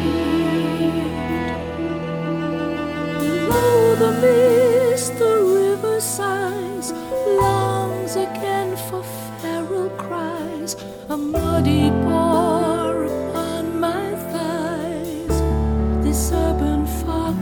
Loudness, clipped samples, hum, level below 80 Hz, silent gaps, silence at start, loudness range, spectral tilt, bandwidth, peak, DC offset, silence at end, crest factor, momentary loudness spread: -20 LUFS; under 0.1%; none; -32 dBFS; none; 0 s; 6 LU; -5.5 dB/octave; over 20 kHz; -4 dBFS; under 0.1%; 0 s; 16 dB; 11 LU